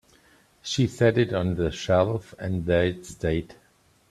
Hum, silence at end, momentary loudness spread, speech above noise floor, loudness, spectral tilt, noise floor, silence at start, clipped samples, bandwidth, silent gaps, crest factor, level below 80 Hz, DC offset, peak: none; 0.6 s; 9 LU; 35 dB; -25 LUFS; -6 dB/octave; -59 dBFS; 0.65 s; under 0.1%; 13 kHz; none; 20 dB; -48 dBFS; under 0.1%; -6 dBFS